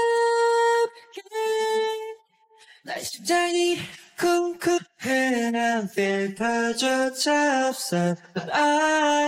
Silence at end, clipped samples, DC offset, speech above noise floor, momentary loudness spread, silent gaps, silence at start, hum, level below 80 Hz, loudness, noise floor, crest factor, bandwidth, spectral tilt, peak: 0 s; under 0.1%; under 0.1%; 34 dB; 11 LU; none; 0 s; none; -68 dBFS; -23 LUFS; -57 dBFS; 14 dB; 16.5 kHz; -3.5 dB/octave; -8 dBFS